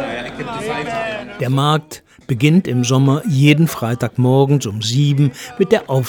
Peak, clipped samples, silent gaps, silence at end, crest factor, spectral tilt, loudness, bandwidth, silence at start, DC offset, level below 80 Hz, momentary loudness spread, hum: 0 dBFS; under 0.1%; none; 0 s; 16 dB; -6 dB/octave; -16 LUFS; 18 kHz; 0 s; under 0.1%; -52 dBFS; 12 LU; none